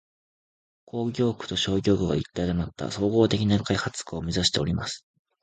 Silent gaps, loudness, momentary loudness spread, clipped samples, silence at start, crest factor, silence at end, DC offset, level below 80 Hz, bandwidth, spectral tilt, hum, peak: none; -26 LUFS; 10 LU; under 0.1%; 0.95 s; 20 dB; 0.45 s; under 0.1%; -46 dBFS; 9.4 kHz; -5.5 dB/octave; none; -6 dBFS